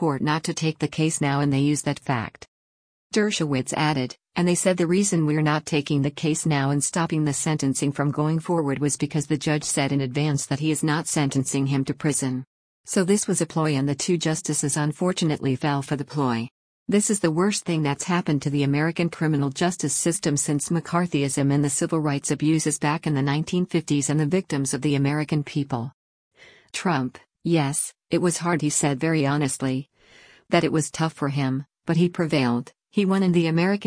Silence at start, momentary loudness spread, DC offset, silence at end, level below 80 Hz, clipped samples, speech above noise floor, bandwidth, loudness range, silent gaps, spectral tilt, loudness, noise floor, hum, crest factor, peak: 0 s; 5 LU; under 0.1%; 0 s; -60 dBFS; under 0.1%; 30 dB; 10.5 kHz; 2 LU; 2.48-3.10 s, 12.47-12.84 s, 16.51-16.86 s, 25.94-26.31 s; -5 dB/octave; -23 LUFS; -53 dBFS; none; 16 dB; -6 dBFS